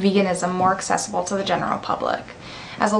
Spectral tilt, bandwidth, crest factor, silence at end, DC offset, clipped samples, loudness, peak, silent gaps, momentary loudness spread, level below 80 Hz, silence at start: -4.5 dB/octave; 12.5 kHz; 18 dB; 0 s; under 0.1%; under 0.1%; -22 LUFS; -4 dBFS; none; 12 LU; -54 dBFS; 0 s